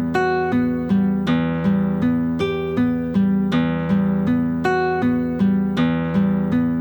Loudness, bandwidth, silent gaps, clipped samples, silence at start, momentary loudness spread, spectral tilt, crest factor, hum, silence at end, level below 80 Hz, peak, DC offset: -20 LUFS; 19.5 kHz; none; under 0.1%; 0 s; 2 LU; -8.5 dB/octave; 12 dB; none; 0 s; -44 dBFS; -8 dBFS; under 0.1%